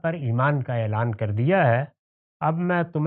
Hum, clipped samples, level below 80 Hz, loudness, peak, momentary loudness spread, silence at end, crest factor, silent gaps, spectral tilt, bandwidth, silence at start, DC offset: none; under 0.1%; -66 dBFS; -23 LUFS; -6 dBFS; 6 LU; 0 s; 16 dB; 1.99-2.40 s; -12 dB/octave; 4.1 kHz; 0.05 s; under 0.1%